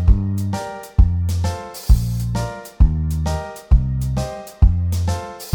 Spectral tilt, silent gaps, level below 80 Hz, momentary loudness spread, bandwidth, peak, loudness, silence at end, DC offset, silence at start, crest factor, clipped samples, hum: -7 dB/octave; none; -20 dBFS; 9 LU; 19.5 kHz; -2 dBFS; -21 LUFS; 0 s; under 0.1%; 0 s; 16 dB; under 0.1%; none